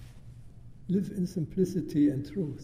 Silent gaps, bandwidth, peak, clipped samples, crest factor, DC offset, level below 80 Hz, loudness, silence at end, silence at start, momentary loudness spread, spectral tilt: none; 15.5 kHz; -16 dBFS; under 0.1%; 16 dB; under 0.1%; -54 dBFS; -30 LUFS; 0 s; 0 s; 23 LU; -8.5 dB/octave